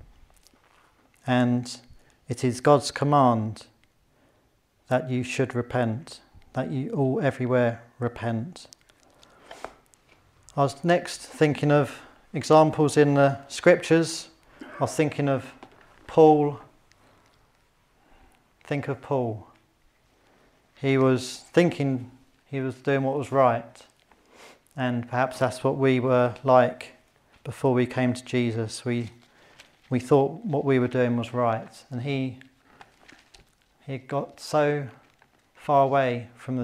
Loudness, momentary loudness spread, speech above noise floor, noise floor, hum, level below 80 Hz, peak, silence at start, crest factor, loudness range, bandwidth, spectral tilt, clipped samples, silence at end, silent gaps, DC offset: -24 LUFS; 18 LU; 42 dB; -66 dBFS; none; -64 dBFS; -4 dBFS; 1.25 s; 22 dB; 9 LU; 14 kHz; -6.5 dB/octave; under 0.1%; 0 s; none; under 0.1%